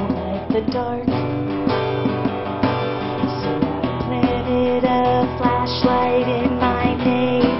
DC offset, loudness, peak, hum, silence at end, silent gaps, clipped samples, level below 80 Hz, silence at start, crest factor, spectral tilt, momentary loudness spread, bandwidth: 0.5%; -20 LUFS; -2 dBFS; none; 0 s; none; under 0.1%; -40 dBFS; 0 s; 18 dB; -5.5 dB/octave; 5 LU; 6 kHz